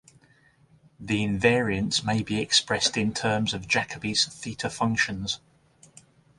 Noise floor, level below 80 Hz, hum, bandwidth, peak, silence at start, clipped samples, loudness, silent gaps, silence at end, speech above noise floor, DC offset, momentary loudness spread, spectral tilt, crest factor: -60 dBFS; -52 dBFS; none; 11.5 kHz; -8 dBFS; 1 s; under 0.1%; -25 LUFS; none; 1 s; 34 dB; under 0.1%; 9 LU; -3.5 dB/octave; 20 dB